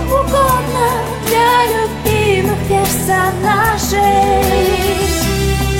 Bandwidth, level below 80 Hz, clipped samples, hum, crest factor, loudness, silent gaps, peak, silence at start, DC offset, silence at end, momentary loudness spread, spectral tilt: 17 kHz; -24 dBFS; under 0.1%; none; 12 dB; -13 LUFS; none; 0 dBFS; 0 s; under 0.1%; 0 s; 4 LU; -4.5 dB/octave